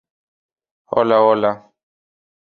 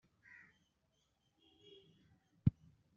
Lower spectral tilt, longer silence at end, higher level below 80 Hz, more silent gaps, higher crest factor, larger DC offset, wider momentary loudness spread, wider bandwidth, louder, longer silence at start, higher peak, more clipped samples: about the same, -8 dB/octave vs -9 dB/octave; first, 1 s vs 0.5 s; about the same, -64 dBFS vs -64 dBFS; neither; second, 18 dB vs 30 dB; neither; second, 10 LU vs 24 LU; about the same, 4.8 kHz vs 4.7 kHz; first, -16 LUFS vs -39 LUFS; second, 0.9 s vs 2.45 s; first, -2 dBFS vs -18 dBFS; neither